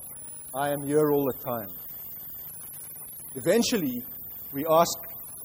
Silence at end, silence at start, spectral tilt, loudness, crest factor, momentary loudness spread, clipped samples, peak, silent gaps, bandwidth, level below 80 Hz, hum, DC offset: 0 s; 0 s; -4.5 dB/octave; -28 LUFS; 20 dB; 15 LU; under 0.1%; -8 dBFS; none; over 20 kHz; -62 dBFS; none; under 0.1%